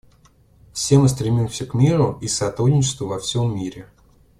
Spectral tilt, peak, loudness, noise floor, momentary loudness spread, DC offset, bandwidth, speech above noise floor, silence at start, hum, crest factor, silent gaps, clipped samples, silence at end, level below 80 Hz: -6 dB/octave; -2 dBFS; -20 LUFS; -54 dBFS; 10 LU; under 0.1%; 13 kHz; 35 dB; 0.75 s; none; 18 dB; none; under 0.1%; 0.55 s; -46 dBFS